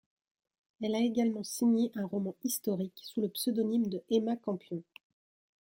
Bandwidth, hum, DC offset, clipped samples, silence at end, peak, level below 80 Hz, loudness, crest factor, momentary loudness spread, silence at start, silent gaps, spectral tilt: 16.5 kHz; none; under 0.1%; under 0.1%; 0.8 s; -18 dBFS; -78 dBFS; -33 LUFS; 16 dB; 8 LU; 0.8 s; none; -5.5 dB/octave